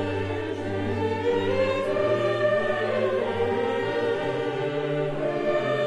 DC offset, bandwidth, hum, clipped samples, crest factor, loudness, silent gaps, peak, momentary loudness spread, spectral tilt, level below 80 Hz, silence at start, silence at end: under 0.1%; 11.5 kHz; none; under 0.1%; 14 dB; -26 LUFS; none; -12 dBFS; 5 LU; -6.5 dB/octave; -56 dBFS; 0 s; 0 s